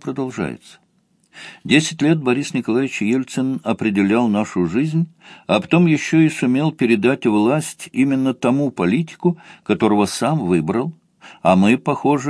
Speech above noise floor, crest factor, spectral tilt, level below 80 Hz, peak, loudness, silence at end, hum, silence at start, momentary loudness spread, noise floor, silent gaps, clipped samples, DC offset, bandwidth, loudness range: 43 dB; 18 dB; -6 dB/octave; -58 dBFS; 0 dBFS; -18 LUFS; 0 s; none; 0.05 s; 10 LU; -61 dBFS; none; under 0.1%; under 0.1%; 11 kHz; 3 LU